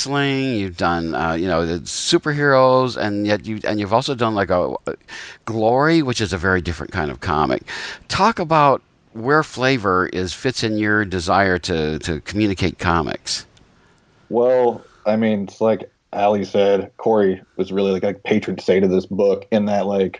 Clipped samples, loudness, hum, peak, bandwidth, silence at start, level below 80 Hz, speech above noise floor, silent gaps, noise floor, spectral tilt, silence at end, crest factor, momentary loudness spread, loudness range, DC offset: under 0.1%; -19 LUFS; none; -2 dBFS; 10.5 kHz; 0 s; -46 dBFS; 36 dB; none; -54 dBFS; -5.5 dB/octave; 0 s; 18 dB; 9 LU; 3 LU; under 0.1%